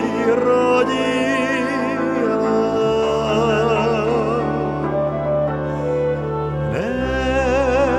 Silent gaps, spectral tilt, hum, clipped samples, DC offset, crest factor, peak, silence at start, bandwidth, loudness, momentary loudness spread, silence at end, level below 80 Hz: none; -6.5 dB/octave; none; under 0.1%; under 0.1%; 12 dB; -6 dBFS; 0 s; 12 kHz; -19 LUFS; 5 LU; 0 s; -36 dBFS